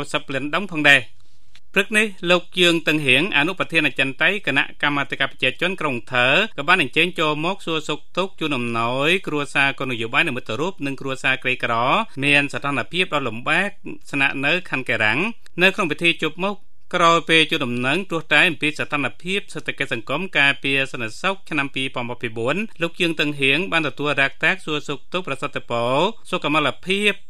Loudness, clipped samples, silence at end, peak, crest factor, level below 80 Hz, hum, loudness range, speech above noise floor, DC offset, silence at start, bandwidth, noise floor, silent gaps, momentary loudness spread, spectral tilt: -20 LUFS; under 0.1%; 0.15 s; 0 dBFS; 22 dB; -58 dBFS; none; 4 LU; 34 dB; 3%; 0 s; 14.5 kHz; -55 dBFS; none; 10 LU; -4 dB/octave